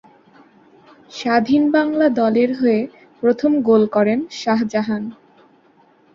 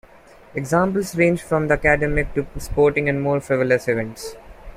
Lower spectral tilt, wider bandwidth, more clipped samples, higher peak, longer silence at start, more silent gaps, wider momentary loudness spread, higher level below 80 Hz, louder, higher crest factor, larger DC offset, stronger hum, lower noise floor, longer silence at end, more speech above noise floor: about the same, -6.5 dB/octave vs -6.5 dB/octave; second, 7.4 kHz vs 16 kHz; neither; about the same, -2 dBFS vs -2 dBFS; first, 1.1 s vs 0.55 s; neither; about the same, 11 LU vs 13 LU; second, -62 dBFS vs -36 dBFS; first, -17 LUFS vs -20 LUFS; about the same, 16 dB vs 18 dB; neither; neither; first, -54 dBFS vs -47 dBFS; first, 1.05 s vs 0 s; first, 37 dB vs 27 dB